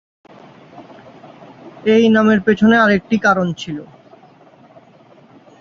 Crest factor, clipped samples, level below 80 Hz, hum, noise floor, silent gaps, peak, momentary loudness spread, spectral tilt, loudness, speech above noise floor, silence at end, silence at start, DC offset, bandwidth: 16 dB; under 0.1%; -54 dBFS; none; -47 dBFS; none; -2 dBFS; 14 LU; -6.5 dB/octave; -14 LUFS; 33 dB; 1.75 s; 0.75 s; under 0.1%; 7 kHz